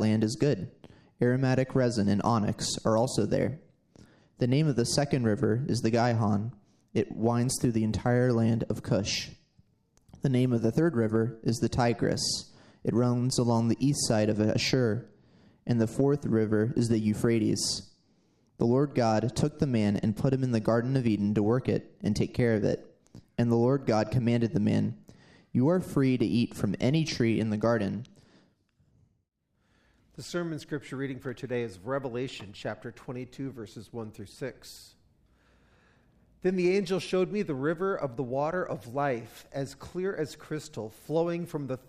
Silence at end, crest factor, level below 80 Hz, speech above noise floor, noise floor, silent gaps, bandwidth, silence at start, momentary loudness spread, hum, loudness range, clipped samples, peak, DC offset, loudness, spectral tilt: 0.1 s; 18 dB; -58 dBFS; 43 dB; -70 dBFS; none; 13.5 kHz; 0 s; 12 LU; none; 9 LU; under 0.1%; -10 dBFS; under 0.1%; -28 LUFS; -6 dB/octave